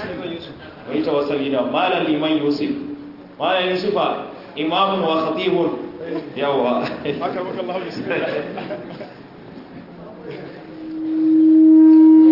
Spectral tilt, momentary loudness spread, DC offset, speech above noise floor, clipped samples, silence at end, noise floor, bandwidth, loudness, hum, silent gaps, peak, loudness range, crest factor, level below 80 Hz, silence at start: -8 dB/octave; 24 LU; under 0.1%; 17 dB; under 0.1%; 0 s; -38 dBFS; 5.8 kHz; -18 LUFS; none; none; -4 dBFS; 10 LU; 14 dB; -62 dBFS; 0 s